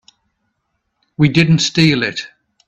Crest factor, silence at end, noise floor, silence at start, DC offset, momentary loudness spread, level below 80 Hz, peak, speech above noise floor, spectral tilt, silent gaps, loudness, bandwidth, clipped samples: 16 dB; 0.4 s; -70 dBFS; 1.2 s; under 0.1%; 20 LU; -48 dBFS; 0 dBFS; 57 dB; -5 dB/octave; none; -14 LUFS; 8.4 kHz; under 0.1%